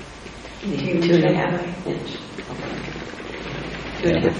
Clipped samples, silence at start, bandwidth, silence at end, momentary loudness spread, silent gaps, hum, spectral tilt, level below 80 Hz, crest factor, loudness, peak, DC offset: under 0.1%; 0 s; 10 kHz; 0 s; 16 LU; none; none; -6.5 dB/octave; -44 dBFS; 20 dB; -24 LUFS; -4 dBFS; under 0.1%